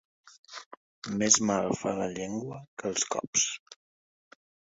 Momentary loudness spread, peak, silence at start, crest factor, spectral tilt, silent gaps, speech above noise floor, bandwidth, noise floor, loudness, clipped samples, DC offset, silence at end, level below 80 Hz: 22 LU; -6 dBFS; 0.25 s; 26 dB; -2.5 dB/octave; 0.39-0.44 s, 0.66-0.71 s, 0.77-1.02 s, 2.68-2.77 s, 3.27-3.33 s, 3.60-3.66 s; over 60 dB; 8 kHz; under -90 dBFS; -28 LUFS; under 0.1%; under 0.1%; 0.95 s; -66 dBFS